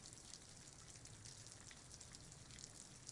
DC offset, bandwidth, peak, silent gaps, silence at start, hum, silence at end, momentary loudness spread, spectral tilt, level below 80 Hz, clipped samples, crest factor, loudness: under 0.1%; 12 kHz; -32 dBFS; none; 0 s; none; 0 s; 2 LU; -2 dB/octave; -72 dBFS; under 0.1%; 28 dB; -57 LUFS